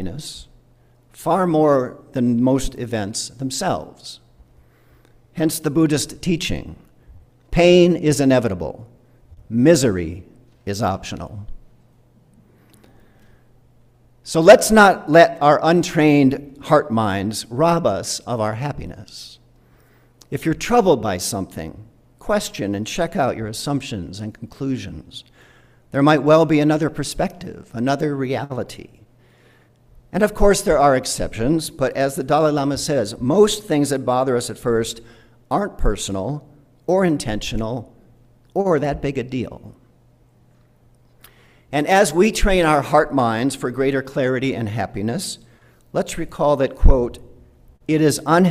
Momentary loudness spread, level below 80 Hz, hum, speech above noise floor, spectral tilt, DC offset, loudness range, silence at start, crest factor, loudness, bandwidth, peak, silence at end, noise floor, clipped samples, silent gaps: 18 LU; -32 dBFS; none; 36 dB; -5.5 dB/octave; under 0.1%; 10 LU; 0 s; 20 dB; -19 LUFS; 16 kHz; 0 dBFS; 0 s; -54 dBFS; under 0.1%; none